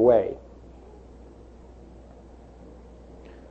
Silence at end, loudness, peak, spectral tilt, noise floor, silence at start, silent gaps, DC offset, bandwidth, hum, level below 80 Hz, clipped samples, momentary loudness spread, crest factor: 3.15 s; -24 LUFS; -6 dBFS; -9 dB/octave; -47 dBFS; 0 s; none; under 0.1%; 6.2 kHz; 60 Hz at -50 dBFS; -50 dBFS; under 0.1%; 20 LU; 22 dB